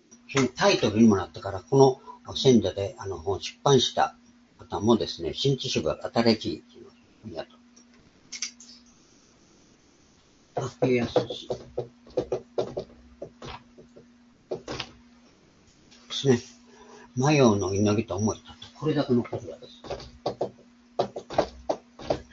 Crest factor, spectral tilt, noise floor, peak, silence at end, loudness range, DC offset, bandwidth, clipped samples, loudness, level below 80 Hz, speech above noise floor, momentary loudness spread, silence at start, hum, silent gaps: 24 dB; -5.5 dB/octave; -59 dBFS; -4 dBFS; 0.1 s; 16 LU; under 0.1%; 7.8 kHz; under 0.1%; -26 LUFS; -56 dBFS; 35 dB; 19 LU; 0.3 s; none; none